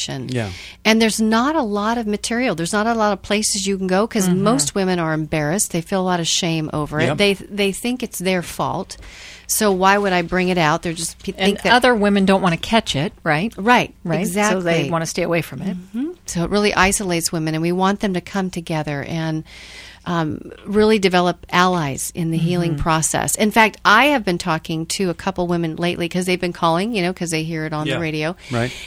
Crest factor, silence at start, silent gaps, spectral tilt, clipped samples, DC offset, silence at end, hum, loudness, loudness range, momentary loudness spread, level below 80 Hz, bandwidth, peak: 18 dB; 0 s; none; -4 dB/octave; under 0.1%; under 0.1%; 0 s; none; -19 LUFS; 4 LU; 9 LU; -44 dBFS; 16 kHz; 0 dBFS